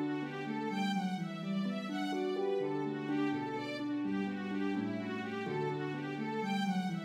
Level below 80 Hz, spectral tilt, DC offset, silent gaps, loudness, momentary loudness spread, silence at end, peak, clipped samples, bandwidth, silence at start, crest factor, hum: -84 dBFS; -6.5 dB/octave; under 0.1%; none; -37 LUFS; 4 LU; 0 s; -24 dBFS; under 0.1%; 12.5 kHz; 0 s; 12 dB; none